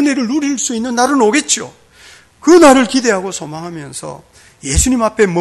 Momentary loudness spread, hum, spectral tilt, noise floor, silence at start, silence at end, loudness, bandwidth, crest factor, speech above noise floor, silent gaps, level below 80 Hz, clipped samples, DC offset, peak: 19 LU; none; -3.5 dB/octave; -42 dBFS; 0 s; 0 s; -12 LUFS; 12.5 kHz; 14 dB; 29 dB; none; -30 dBFS; under 0.1%; under 0.1%; 0 dBFS